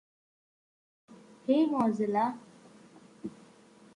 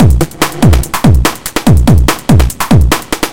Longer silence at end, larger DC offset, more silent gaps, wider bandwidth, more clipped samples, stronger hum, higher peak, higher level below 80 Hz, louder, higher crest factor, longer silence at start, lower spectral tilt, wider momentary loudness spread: first, 0.65 s vs 0 s; second, under 0.1% vs 10%; neither; second, 11 kHz vs 17.5 kHz; second, under 0.1% vs 2%; neither; second, -14 dBFS vs 0 dBFS; second, -78 dBFS vs -14 dBFS; second, -29 LUFS vs -10 LUFS; first, 20 dB vs 8 dB; first, 1.1 s vs 0 s; first, -7 dB/octave vs -5.5 dB/octave; first, 19 LU vs 5 LU